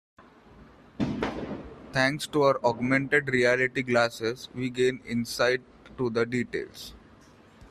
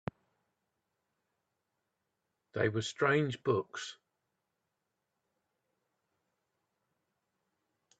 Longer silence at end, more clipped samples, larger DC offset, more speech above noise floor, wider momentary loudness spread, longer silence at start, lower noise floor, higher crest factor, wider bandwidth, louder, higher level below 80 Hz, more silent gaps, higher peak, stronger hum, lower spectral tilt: second, 0.05 s vs 4.05 s; neither; neither; second, 28 dB vs 53 dB; second, 12 LU vs 15 LU; second, 0.2 s vs 2.55 s; second, -54 dBFS vs -86 dBFS; second, 20 dB vs 26 dB; first, 14 kHz vs 8.8 kHz; first, -27 LUFS vs -33 LUFS; first, -56 dBFS vs -76 dBFS; neither; first, -8 dBFS vs -14 dBFS; neither; about the same, -5 dB/octave vs -5.5 dB/octave